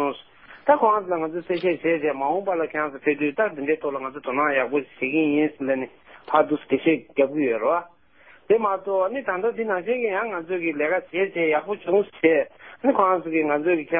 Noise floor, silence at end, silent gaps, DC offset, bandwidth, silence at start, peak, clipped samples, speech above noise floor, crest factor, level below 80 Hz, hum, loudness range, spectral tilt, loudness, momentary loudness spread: -54 dBFS; 0 s; none; 0.1%; 5 kHz; 0 s; -4 dBFS; under 0.1%; 31 dB; 20 dB; -70 dBFS; none; 2 LU; -10 dB/octave; -23 LUFS; 6 LU